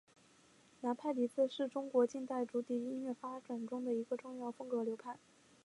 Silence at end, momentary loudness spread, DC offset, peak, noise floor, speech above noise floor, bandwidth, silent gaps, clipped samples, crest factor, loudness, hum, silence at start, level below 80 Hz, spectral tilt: 0.5 s; 11 LU; under 0.1%; -20 dBFS; -67 dBFS; 28 dB; 11.5 kHz; none; under 0.1%; 20 dB; -39 LUFS; none; 0.8 s; -90 dBFS; -5.5 dB/octave